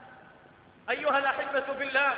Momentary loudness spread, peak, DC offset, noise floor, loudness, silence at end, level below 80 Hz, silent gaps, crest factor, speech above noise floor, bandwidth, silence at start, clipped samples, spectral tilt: 7 LU; -14 dBFS; under 0.1%; -56 dBFS; -28 LUFS; 0 s; -72 dBFS; none; 16 dB; 28 dB; 5 kHz; 0 s; under 0.1%; -6.5 dB/octave